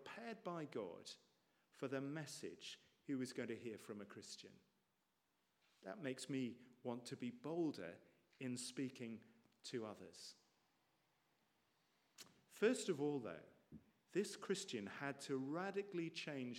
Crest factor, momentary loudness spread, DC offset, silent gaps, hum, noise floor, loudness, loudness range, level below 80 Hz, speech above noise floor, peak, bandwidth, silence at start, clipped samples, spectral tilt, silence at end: 24 dB; 15 LU; under 0.1%; none; none; -86 dBFS; -48 LUFS; 7 LU; under -90 dBFS; 39 dB; -26 dBFS; 16 kHz; 0 s; under 0.1%; -4.5 dB/octave; 0 s